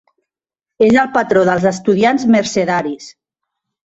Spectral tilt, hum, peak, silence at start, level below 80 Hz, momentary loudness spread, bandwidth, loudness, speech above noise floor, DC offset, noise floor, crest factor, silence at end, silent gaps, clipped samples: -5.5 dB/octave; none; -2 dBFS; 0.8 s; -52 dBFS; 7 LU; 8 kHz; -14 LUFS; 73 dB; under 0.1%; -86 dBFS; 14 dB; 0.75 s; none; under 0.1%